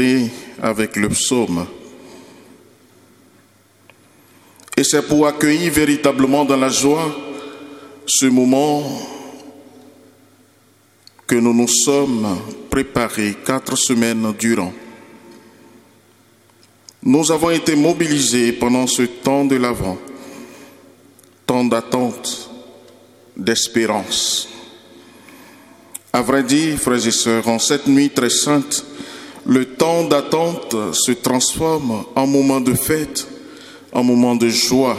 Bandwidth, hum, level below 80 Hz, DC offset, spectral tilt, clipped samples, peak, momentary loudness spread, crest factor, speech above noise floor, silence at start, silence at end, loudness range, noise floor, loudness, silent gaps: 16 kHz; none; -48 dBFS; under 0.1%; -3.5 dB/octave; under 0.1%; 0 dBFS; 17 LU; 18 dB; 37 dB; 0 s; 0 s; 6 LU; -53 dBFS; -16 LUFS; none